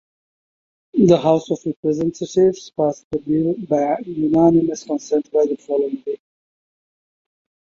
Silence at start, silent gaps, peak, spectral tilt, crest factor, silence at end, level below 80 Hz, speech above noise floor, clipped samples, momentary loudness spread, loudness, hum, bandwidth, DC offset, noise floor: 0.95 s; 1.76-1.83 s, 3.04-3.10 s; -2 dBFS; -7.5 dB/octave; 18 dB; 1.5 s; -56 dBFS; over 72 dB; under 0.1%; 11 LU; -19 LUFS; none; 7.4 kHz; under 0.1%; under -90 dBFS